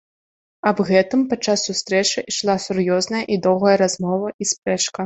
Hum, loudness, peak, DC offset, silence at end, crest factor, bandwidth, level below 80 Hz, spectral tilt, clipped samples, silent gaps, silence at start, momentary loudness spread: none; -19 LUFS; -2 dBFS; under 0.1%; 0 s; 18 dB; 8.4 kHz; -60 dBFS; -4 dB/octave; under 0.1%; 4.34-4.39 s; 0.65 s; 6 LU